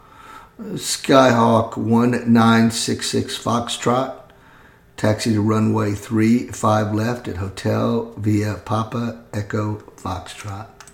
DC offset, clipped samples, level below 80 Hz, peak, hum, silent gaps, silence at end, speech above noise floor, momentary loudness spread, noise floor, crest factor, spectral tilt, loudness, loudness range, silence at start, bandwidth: under 0.1%; under 0.1%; -52 dBFS; 0 dBFS; none; none; 0.25 s; 30 dB; 15 LU; -48 dBFS; 20 dB; -5.5 dB/octave; -19 LUFS; 7 LU; 0.25 s; 17 kHz